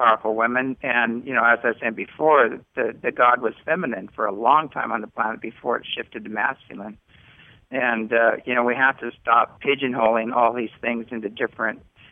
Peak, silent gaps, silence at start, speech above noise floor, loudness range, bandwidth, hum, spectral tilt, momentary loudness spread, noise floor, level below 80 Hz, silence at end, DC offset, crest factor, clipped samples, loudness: -4 dBFS; none; 0 s; 29 dB; 5 LU; 3.8 kHz; none; -8 dB/octave; 11 LU; -51 dBFS; -64 dBFS; 0.35 s; under 0.1%; 18 dB; under 0.1%; -22 LUFS